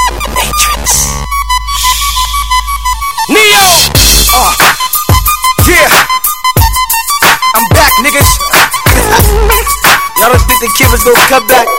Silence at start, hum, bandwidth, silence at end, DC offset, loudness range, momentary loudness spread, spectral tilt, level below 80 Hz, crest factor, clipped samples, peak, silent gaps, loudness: 0 s; none; over 20 kHz; 0 s; 3%; 2 LU; 8 LU; -2.5 dB/octave; -16 dBFS; 8 dB; 4%; 0 dBFS; none; -6 LUFS